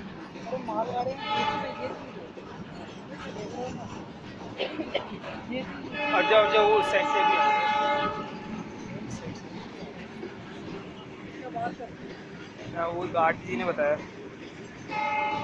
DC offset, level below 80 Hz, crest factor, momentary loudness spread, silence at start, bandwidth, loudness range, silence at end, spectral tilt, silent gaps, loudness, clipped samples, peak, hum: under 0.1%; -60 dBFS; 22 dB; 19 LU; 0 s; 10.5 kHz; 15 LU; 0 s; -5 dB/octave; none; -28 LUFS; under 0.1%; -8 dBFS; none